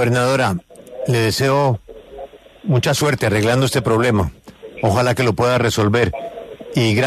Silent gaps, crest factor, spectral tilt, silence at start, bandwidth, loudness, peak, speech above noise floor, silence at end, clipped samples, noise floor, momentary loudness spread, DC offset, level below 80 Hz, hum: none; 14 dB; -5.5 dB/octave; 0 s; 13.5 kHz; -17 LUFS; -4 dBFS; 20 dB; 0 s; under 0.1%; -37 dBFS; 17 LU; under 0.1%; -42 dBFS; none